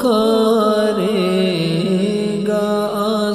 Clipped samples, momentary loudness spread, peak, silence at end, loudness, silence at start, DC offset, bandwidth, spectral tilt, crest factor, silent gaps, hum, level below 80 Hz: under 0.1%; 4 LU; -4 dBFS; 0 s; -17 LUFS; 0 s; under 0.1%; 15.5 kHz; -6 dB/octave; 12 dB; none; none; -50 dBFS